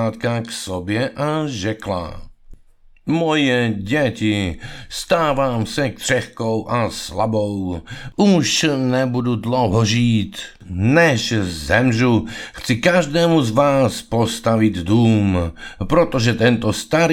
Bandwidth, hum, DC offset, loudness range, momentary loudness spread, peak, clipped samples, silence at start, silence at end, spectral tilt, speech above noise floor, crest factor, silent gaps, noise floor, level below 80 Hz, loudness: 16 kHz; none; under 0.1%; 4 LU; 11 LU; 0 dBFS; under 0.1%; 0 s; 0 s; -5.5 dB/octave; 30 dB; 18 dB; none; -48 dBFS; -40 dBFS; -18 LUFS